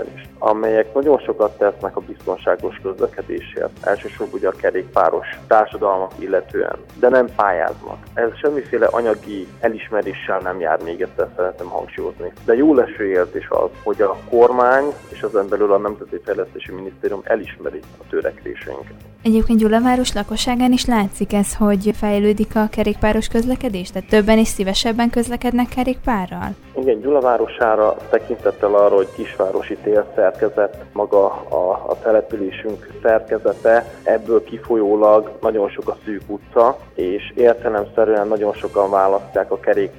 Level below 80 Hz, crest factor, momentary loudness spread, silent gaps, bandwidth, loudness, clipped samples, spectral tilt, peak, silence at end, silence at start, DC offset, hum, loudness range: -38 dBFS; 18 dB; 12 LU; none; 17.5 kHz; -18 LUFS; under 0.1%; -5.5 dB/octave; 0 dBFS; 0 s; 0 s; under 0.1%; none; 4 LU